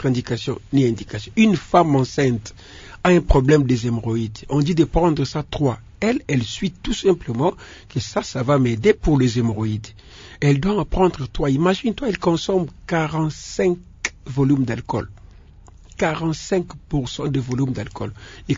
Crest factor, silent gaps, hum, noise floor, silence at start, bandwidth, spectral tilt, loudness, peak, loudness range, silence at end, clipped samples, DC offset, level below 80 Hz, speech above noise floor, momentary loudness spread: 20 dB; none; none; -45 dBFS; 0 s; 7.8 kHz; -6.5 dB/octave; -20 LUFS; 0 dBFS; 5 LU; 0 s; under 0.1%; under 0.1%; -36 dBFS; 25 dB; 11 LU